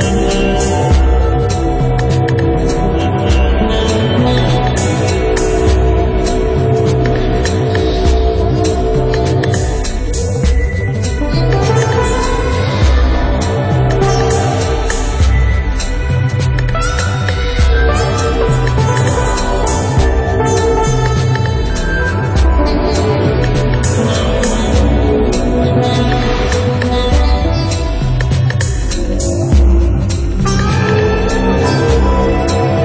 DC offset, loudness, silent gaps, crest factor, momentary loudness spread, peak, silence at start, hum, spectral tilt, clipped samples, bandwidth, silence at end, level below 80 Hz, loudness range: under 0.1%; -13 LUFS; none; 10 dB; 4 LU; -2 dBFS; 0 s; none; -6 dB/octave; under 0.1%; 8 kHz; 0 s; -16 dBFS; 1 LU